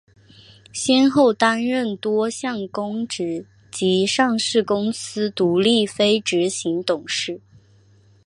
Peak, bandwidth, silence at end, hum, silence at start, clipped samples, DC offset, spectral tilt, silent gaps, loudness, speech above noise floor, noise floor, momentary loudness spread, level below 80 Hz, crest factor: -2 dBFS; 11.5 kHz; 0.9 s; none; 0.75 s; under 0.1%; under 0.1%; -4 dB/octave; none; -20 LUFS; 34 dB; -53 dBFS; 10 LU; -62 dBFS; 20 dB